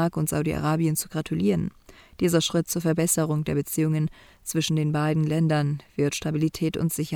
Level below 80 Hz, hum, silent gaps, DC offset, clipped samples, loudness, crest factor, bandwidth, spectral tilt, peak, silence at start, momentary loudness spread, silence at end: -52 dBFS; none; none; under 0.1%; under 0.1%; -25 LUFS; 18 dB; 19.5 kHz; -5.5 dB/octave; -6 dBFS; 0 s; 5 LU; 0 s